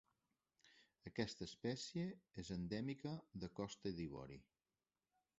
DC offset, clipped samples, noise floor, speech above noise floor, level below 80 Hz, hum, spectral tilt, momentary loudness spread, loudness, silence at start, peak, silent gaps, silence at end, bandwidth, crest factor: under 0.1%; under 0.1%; under -90 dBFS; over 42 dB; -70 dBFS; none; -5.5 dB/octave; 9 LU; -49 LUFS; 0.65 s; -26 dBFS; none; 0.95 s; 8 kHz; 24 dB